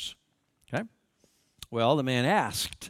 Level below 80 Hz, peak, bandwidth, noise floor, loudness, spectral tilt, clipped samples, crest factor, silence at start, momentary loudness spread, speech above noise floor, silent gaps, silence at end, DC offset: -62 dBFS; -10 dBFS; 16.5 kHz; -72 dBFS; -28 LUFS; -4.5 dB/octave; under 0.1%; 20 dB; 0 s; 16 LU; 45 dB; none; 0 s; under 0.1%